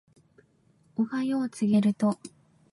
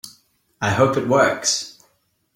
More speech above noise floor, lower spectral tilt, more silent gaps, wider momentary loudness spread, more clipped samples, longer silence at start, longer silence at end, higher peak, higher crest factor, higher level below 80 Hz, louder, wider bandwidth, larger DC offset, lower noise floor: second, 38 dB vs 47 dB; first, -7 dB/octave vs -3.5 dB/octave; neither; about the same, 15 LU vs 15 LU; neither; first, 1 s vs 0.05 s; second, 0.45 s vs 0.65 s; second, -14 dBFS vs -4 dBFS; about the same, 14 dB vs 18 dB; second, -74 dBFS vs -56 dBFS; second, -27 LUFS vs -19 LUFS; second, 11.5 kHz vs 16.5 kHz; neither; about the same, -64 dBFS vs -65 dBFS